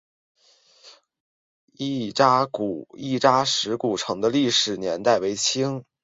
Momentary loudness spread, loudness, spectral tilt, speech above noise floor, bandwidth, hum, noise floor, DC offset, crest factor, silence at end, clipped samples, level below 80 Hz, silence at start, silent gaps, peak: 10 LU; -22 LUFS; -3.5 dB/octave; 34 dB; 8 kHz; none; -57 dBFS; under 0.1%; 20 dB; 0.2 s; under 0.1%; -64 dBFS; 0.85 s; 1.20-1.68 s; -4 dBFS